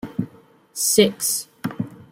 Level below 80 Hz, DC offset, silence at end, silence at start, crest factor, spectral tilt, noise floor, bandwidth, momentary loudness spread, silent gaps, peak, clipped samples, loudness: -60 dBFS; under 0.1%; 0.1 s; 0.05 s; 20 dB; -3 dB/octave; -50 dBFS; 16.5 kHz; 17 LU; none; -2 dBFS; under 0.1%; -20 LUFS